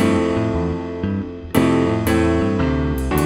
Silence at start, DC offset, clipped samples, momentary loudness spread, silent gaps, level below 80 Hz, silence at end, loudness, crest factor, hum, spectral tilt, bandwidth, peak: 0 s; under 0.1%; under 0.1%; 7 LU; none; -30 dBFS; 0 s; -19 LUFS; 18 dB; none; -7 dB/octave; 16 kHz; 0 dBFS